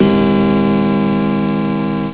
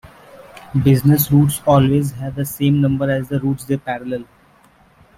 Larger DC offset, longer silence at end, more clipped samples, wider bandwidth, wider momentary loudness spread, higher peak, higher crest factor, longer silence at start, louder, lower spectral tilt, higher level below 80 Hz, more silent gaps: neither; second, 0 s vs 0.95 s; neither; second, 4 kHz vs 16 kHz; second, 5 LU vs 11 LU; about the same, -2 dBFS vs -2 dBFS; about the same, 12 dB vs 16 dB; about the same, 0 s vs 0.05 s; first, -14 LUFS vs -17 LUFS; first, -12 dB/octave vs -7 dB/octave; first, -38 dBFS vs -44 dBFS; neither